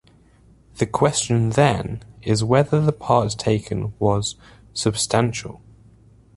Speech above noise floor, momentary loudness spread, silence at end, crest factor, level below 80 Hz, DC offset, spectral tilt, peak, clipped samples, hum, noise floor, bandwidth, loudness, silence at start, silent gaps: 33 dB; 13 LU; 0.8 s; 20 dB; -46 dBFS; under 0.1%; -5 dB/octave; -2 dBFS; under 0.1%; none; -53 dBFS; 11.5 kHz; -21 LUFS; 0.75 s; none